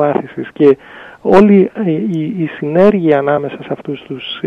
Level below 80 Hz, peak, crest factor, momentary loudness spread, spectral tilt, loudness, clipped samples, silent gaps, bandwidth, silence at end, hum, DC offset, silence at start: -48 dBFS; 0 dBFS; 12 dB; 14 LU; -8.5 dB/octave; -13 LUFS; under 0.1%; none; 6.6 kHz; 0 s; none; under 0.1%; 0 s